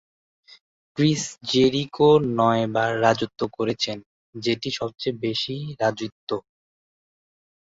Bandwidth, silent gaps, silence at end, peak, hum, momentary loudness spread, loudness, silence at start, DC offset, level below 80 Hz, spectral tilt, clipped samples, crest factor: 8 kHz; 4.06-4.33 s, 6.12-6.27 s; 1.25 s; -4 dBFS; none; 13 LU; -23 LUFS; 0.95 s; under 0.1%; -60 dBFS; -5 dB/octave; under 0.1%; 20 dB